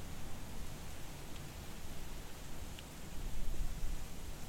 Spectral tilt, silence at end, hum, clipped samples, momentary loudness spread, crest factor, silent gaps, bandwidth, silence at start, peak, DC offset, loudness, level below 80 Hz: -4 dB/octave; 0 s; none; under 0.1%; 4 LU; 16 dB; none; 16.5 kHz; 0 s; -24 dBFS; under 0.1%; -49 LUFS; -44 dBFS